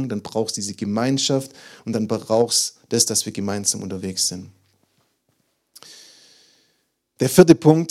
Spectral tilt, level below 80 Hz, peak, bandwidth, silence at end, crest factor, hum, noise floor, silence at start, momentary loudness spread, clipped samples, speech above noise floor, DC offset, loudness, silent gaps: -4.5 dB/octave; -58 dBFS; 0 dBFS; 16.5 kHz; 0 s; 22 dB; none; -69 dBFS; 0 s; 13 LU; under 0.1%; 50 dB; under 0.1%; -19 LUFS; none